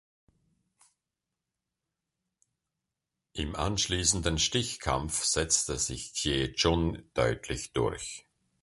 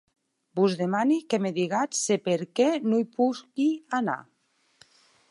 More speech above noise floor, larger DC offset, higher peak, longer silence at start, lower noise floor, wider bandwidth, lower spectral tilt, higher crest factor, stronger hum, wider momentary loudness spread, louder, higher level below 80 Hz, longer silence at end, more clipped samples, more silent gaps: first, 58 dB vs 36 dB; neither; about the same, -10 dBFS vs -10 dBFS; first, 3.35 s vs 0.55 s; first, -88 dBFS vs -62 dBFS; about the same, 11.5 kHz vs 11.5 kHz; second, -3 dB/octave vs -5 dB/octave; first, 24 dB vs 16 dB; neither; first, 10 LU vs 4 LU; second, -29 LUFS vs -26 LUFS; first, -44 dBFS vs -80 dBFS; second, 0.45 s vs 1.1 s; neither; neither